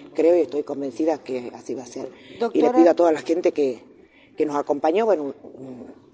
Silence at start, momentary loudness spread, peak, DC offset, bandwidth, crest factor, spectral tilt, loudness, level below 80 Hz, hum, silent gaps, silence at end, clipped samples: 0 s; 21 LU; -4 dBFS; under 0.1%; 8.6 kHz; 18 dB; -5.5 dB/octave; -21 LUFS; -70 dBFS; none; none; 0.25 s; under 0.1%